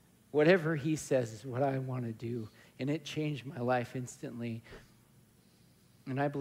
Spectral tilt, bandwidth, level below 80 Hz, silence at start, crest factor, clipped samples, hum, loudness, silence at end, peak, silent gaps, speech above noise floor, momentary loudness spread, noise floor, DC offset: -6.5 dB/octave; 16 kHz; -70 dBFS; 0.35 s; 20 dB; under 0.1%; none; -34 LUFS; 0 s; -14 dBFS; none; 31 dB; 14 LU; -64 dBFS; under 0.1%